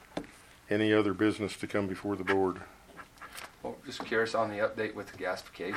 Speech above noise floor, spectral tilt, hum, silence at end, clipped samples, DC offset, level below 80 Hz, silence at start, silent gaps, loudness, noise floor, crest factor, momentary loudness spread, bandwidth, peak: 20 dB; -5.5 dB/octave; none; 0 s; under 0.1%; under 0.1%; -64 dBFS; 0 s; none; -32 LUFS; -51 dBFS; 20 dB; 18 LU; 15.5 kHz; -12 dBFS